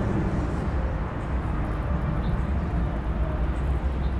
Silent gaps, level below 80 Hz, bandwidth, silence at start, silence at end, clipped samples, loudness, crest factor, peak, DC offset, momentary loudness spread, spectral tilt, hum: none; -28 dBFS; 7 kHz; 0 s; 0 s; under 0.1%; -28 LUFS; 12 dB; -14 dBFS; under 0.1%; 2 LU; -8.5 dB/octave; none